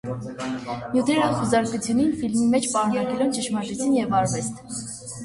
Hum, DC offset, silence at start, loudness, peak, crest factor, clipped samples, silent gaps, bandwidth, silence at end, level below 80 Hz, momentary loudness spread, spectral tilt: none; under 0.1%; 0.05 s; -23 LUFS; -8 dBFS; 16 dB; under 0.1%; none; 11.5 kHz; 0 s; -54 dBFS; 10 LU; -5 dB/octave